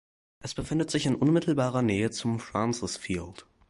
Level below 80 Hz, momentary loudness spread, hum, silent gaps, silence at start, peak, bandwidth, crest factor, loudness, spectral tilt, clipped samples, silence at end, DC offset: -52 dBFS; 12 LU; none; none; 0.4 s; -12 dBFS; 11.5 kHz; 16 dB; -28 LUFS; -5.5 dB/octave; under 0.1%; 0.3 s; under 0.1%